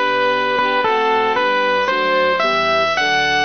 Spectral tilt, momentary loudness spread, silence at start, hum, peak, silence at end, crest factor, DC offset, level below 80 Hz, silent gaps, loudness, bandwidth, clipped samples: -3 dB/octave; 1 LU; 0 s; none; -4 dBFS; 0 s; 12 dB; 0.5%; -52 dBFS; none; -16 LUFS; 6.6 kHz; under 0.1%